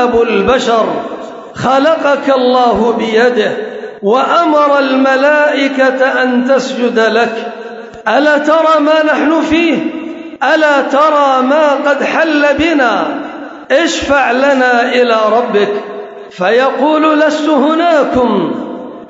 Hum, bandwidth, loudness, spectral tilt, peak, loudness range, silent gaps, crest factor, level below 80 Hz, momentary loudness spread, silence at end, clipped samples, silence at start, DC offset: none; 7.8 kHz; -10 LUFS; -4.5 dB/octave; 0 dBFS; 1 LU; none; 10 dB; -44 dBFS; 11 LU; 0 s; under 0.1%; 0 s; under 0.1%